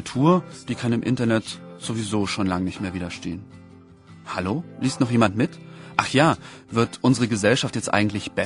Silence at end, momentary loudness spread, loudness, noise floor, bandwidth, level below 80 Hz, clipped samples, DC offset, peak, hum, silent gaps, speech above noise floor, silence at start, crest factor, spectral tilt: 0 s; 13 LU; -23 LUFS; -47 dBFS; 11 kHz; -54 dBFS; under 0.1%; under 0.1%; 0 dBFS; none; none; 25 dB; 0 s; 24 dB; -5.5 dB/octave